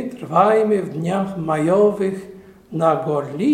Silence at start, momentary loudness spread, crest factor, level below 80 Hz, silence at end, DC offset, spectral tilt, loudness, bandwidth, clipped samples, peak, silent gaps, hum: 0 s; 9 LU; 16 dB; -58 dBFS; 0 s; under 0.1%; -7.5 dB/octave; -19 LUFS; 12.5 kHz; under 0.1%; -2 dBFS; none; none